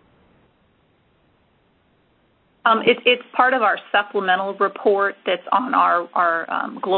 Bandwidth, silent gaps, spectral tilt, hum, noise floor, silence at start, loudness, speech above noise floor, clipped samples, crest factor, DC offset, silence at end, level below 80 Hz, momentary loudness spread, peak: 4.5 kHz; none; -8.5 dB/octave; none; -61 dBFS; 2.65 s; -19 LUFS; 42 dB; under 0.1%; 20 dB; under 0.1%; 0 s; -68 dBFS; 6 LU; 0 dBFS